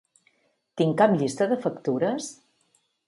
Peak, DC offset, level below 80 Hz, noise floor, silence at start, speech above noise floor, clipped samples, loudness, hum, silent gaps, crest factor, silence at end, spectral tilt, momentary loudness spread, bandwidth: -6 dBFS; under 0.1%; -70 dBFS; -69 dBFS; 0.75 s; 45 dB; under 0.1%; -24 LUFS; none; none; 20 dB; 0.75 s; -6 dB/octave; 13 LU; 11.5 kHz